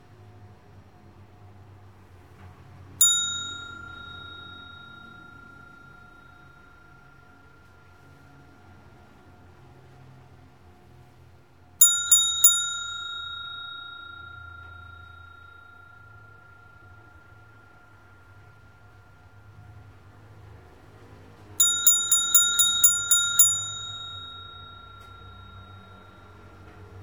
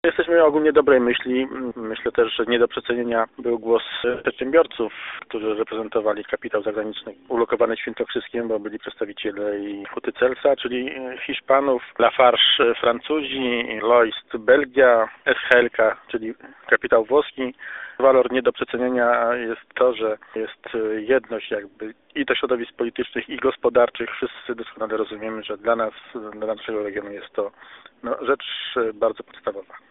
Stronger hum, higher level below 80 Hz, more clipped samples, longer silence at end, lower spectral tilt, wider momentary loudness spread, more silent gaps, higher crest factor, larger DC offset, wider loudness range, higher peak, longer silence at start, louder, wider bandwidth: neither; about the same, -62 dBFS vs -58 dBFS; neither; second, 0 s vs 0.15 s; second, 1.5 dB/octave vs -1 dB/octave; first, 29 LU vs 14 LU; neither; first, 28 dB vs 22 dB; first, 0.1% vs under 0.1%; first, 22 LU vs 8 LU; about the same, -2 dBFS vs 0 dBFS; first, 0.4 s vs 0.05 s; first, -19 LUFS vs -22 LUFS; first, 17.5 kHz vs 4 kHz